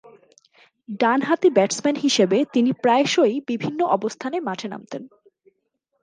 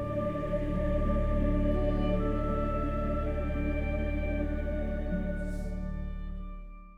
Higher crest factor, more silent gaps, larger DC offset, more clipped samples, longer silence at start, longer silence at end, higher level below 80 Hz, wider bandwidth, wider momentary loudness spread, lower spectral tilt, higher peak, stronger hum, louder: first, 18 dB vs 12 dB; neither; neither; neither; first, 0.9 s vs 0 s; first, 0.95 s vs 0 s; second, -74 dBFS vs -34 dBFS; first, 10 kHz vs 4.7 kHz; first, 14 LU vs 9 LU; second, -4 dB/octave vs -9 dB/octave; first, -4 dBFS vs -18 dBFS; neither; first, -20 LUFS vs -32 LUFS